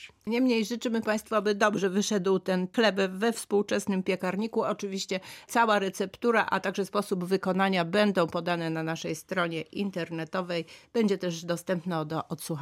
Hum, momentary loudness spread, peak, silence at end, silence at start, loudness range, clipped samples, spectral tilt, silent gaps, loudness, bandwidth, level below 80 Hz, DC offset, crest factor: none; 8 LU; -10 dBFS; 0 s; 0 s; 4 LU; under 0.1%; -5 dB/octave; none; -28 LUFS; 16 kHz; -72 dBFS; under 0.1%; 18 dB